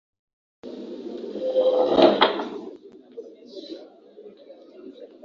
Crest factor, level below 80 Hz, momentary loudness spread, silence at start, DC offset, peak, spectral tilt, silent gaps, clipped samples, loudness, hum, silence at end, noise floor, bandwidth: 24 dB; -68 dBFS; 26 LU; 0.65 s; under 0.1%; -2 dBFS; -5.5 dB/octave; none; under 0.1%; -21 LUFS; none; 0.2 s; -47 dBFS; 7 kHz